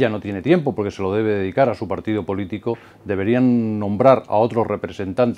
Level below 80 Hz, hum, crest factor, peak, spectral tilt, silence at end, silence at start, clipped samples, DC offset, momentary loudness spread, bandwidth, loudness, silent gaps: -56 dBFS; none; 20 dB; 0 dBFS; -8.5 dB/octave; 0 s; 0 s; under 0.1%; under 0.1%; 10 LU; 8.4 kHz; -20 LUFS; none